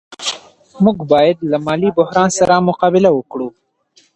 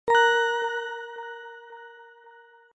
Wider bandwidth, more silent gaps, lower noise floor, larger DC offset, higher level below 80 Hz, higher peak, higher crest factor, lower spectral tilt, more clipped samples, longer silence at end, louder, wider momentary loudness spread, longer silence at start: first, 10.5 kHz vs 9 kHz; neither; about the same, -54 dBFS vs -53 dBFS; neither; first, -52 dBFS vs -72 dBFS; first, 0 dBFS vs -8 dBFS; about the same, 14 dB vs 18 dB; first, -5.5 dB/octave vs -0.5 dB/octave; neither; first, 0.65 s vs 0.45 s; first, -14 LUFS vs -24 LUFS; second, 12 LU vs 25 LU; about the same, 0.1 s vs 0.05 s